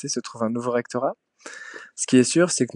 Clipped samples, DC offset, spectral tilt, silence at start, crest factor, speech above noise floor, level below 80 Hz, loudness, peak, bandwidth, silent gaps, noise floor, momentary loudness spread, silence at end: under 0.1%; under 0.1%; -4 dB/octave; 0 s; 18 dB; 19 dB; -76 dBFS; -22 LUFS; -4 dBFS; 11 kHz; none; -41 dBFS; 20 LU; 0.1 s